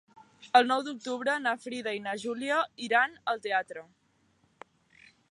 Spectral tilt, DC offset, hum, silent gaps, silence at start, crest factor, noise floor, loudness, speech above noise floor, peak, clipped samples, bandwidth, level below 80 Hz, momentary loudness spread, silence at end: -3 dB/octave; under 0.1%; none; none; 0.4 s; 24 dB; -69 dBFS; -29 LUFS; 40 dB; -8 dBFS; under 0.1%; 11.5 kHz; -80 dBFS; 10 LU; 1.5 s